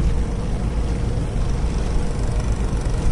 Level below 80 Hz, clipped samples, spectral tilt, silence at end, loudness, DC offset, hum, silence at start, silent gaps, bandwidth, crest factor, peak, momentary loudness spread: -22 dBFS; under 0.1%; -7 dB/octave; 0 s; -24 LUFS; under 0.1%; none; 0 s; none; 11 kHz; 12 dB; -6 dBFS; 1 LU